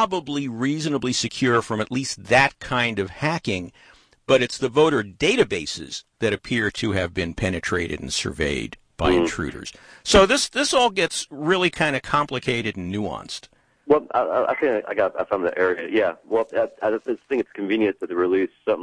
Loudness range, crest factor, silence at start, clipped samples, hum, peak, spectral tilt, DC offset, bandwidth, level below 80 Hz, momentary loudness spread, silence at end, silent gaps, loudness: 4 LU; 20 dB; 0 s; under 0.1%; none; -2 dBFS; -4 dB/octave; under 0.1%; 10.5 kHz; -44 dBFS; 9 LU; 0 s; none; -22 LUFS